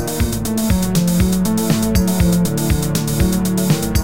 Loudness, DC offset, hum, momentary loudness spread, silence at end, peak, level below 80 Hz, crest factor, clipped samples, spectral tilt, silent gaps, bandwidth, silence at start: -17 LUFS; 2%; none; 3 LU; 0 s; -2 dBFS; -26 dBFS; 14 dB; under 0.1%; -5.5 dB/octave; none; 17 kHz; 0 s